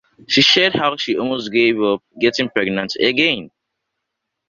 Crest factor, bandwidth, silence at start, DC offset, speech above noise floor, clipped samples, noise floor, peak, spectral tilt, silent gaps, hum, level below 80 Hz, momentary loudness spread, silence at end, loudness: 18 dB; 7.4 kHz; 0.3 s; under 0.1%; 61 dB; under 0.1%; -78 dBFS; 0 dBFS; -4 dB/octave; none; none; -58 dBFS; 9 LU; 1 s; -16 LUFS